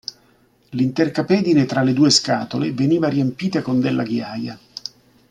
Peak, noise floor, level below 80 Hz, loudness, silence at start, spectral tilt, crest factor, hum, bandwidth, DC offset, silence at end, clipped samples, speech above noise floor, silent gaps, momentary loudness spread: -2 dBFS; -57 dBFS; -60 dBFS; -19 LUFS; 0.7 s; -5 dB/octave; 18 dB; none; 11.5 kHz; under 0.1%; 0.4 s; under 0.1%; 38 dB; none; 17 LU